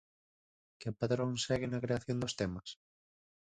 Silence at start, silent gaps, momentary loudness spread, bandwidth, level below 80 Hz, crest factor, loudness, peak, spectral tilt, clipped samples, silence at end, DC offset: 0.8 s; none; 12 LU; 9.4 kHz; -62 dBFS; 18 dB; -37 LUFS; -20 dBFS; -5.5 dB/octave; under 0.1%; 0.85 s; under 0.1%